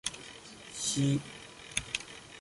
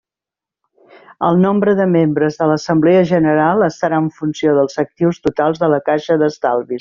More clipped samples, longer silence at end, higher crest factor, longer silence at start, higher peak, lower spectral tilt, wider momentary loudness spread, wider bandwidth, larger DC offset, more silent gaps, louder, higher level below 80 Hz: neither; about the same, 0 s vs 0 s; first, 24 dB vs 12 dB; second, 0.05 s vs 1.2 s; second, -12 dBFS vs -2 dBFS; second, -3.5 dB/octave vs -6.5 dB/octave; first, 17 LU vs 6 LU; first, 11.5 kHz vs 7.4 kHz; neither; neither; second, -34 LUFS vs -15 LUFS; second, -60 dBFS vs -54 dBFS